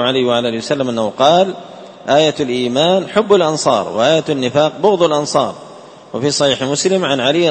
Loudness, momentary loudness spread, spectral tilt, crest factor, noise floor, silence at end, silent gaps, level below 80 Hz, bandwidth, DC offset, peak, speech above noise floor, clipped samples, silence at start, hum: -14 LUFS; 7 LU; -4 dB/octave; 14 dB; -37 dBFS; 0 s; none; -56 dBFS; 8.8 kHz; under 0.1%; 0 dBFS; 23 dB; under 0.1%; 0 s; none